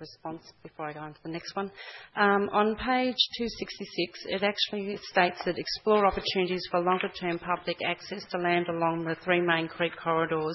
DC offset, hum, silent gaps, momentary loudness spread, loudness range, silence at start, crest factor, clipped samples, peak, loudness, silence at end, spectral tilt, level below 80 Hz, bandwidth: under 0.1%; none; none; 13 LU; 1 LU; 0 s; 22 dB; under 0.1%; -6 dBFS; -28 LUFS; 0 s; -5.5 dB/octave; -58 dBFS; 6 kHz